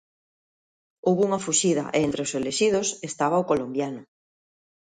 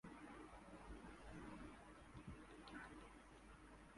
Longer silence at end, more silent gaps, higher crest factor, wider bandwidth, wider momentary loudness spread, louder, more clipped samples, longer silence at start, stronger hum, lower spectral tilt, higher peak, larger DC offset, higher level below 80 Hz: first, 0.85 s vs 0 s; neither; about the same, 18 dB vs 16 dB; second, 9.8 kHz vs 11.5 kHz; about the same, 7 LU vs 6 LU; first, -24 LUFS vs -60 LUFS; neither; first, 1.05 s vs 0.05 s; neither; second, -4 dB/octave vs -5.5 dB/octave; first, -8 dBFS vs -44 dBFS; neither; about the same, -62 dBFS vs -66 dBFS